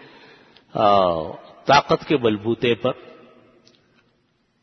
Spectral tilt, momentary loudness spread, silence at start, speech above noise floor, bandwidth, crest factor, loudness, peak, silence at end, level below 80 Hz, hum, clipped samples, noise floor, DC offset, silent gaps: -5.5 dB/octave; 14 LU; 0.75 s; 47 dB; 6.4 kHz; 20 dB; -20 LUFS; -2 dBFS; 1.7 s; -56 dBFS; none; under 0.1%; -66 dBFS; under 0.1%; none